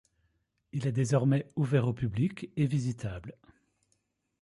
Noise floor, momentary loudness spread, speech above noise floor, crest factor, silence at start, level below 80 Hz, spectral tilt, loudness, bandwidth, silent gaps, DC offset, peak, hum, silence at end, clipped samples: -77 dBFS; 13 LU; 47 dB; 18 dB; 0.75 s; -58 dBFS; -7.5 dB/octave; -30 LUFS; 11 kHz; none; under 0.1%; -14 dBFS; none; 1.1 s; under 0.1%